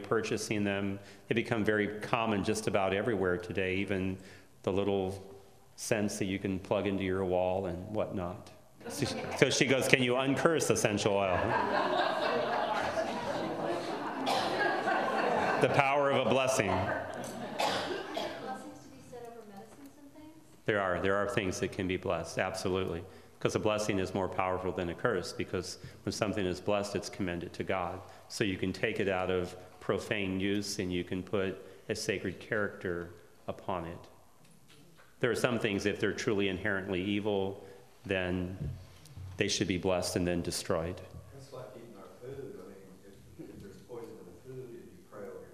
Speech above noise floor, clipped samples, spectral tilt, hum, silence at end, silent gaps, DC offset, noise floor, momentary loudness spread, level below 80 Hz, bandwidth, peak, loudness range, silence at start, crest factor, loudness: 29 dB; under 0.1%; -4.5 dB/octave; none; 0 s; none; under 0.1%; -62 dBFS; 19 LU; -66 dBFS; 15.5 kHz; -2 dBFS; 9 LU; 0 s; 32 dB; -32 LUFS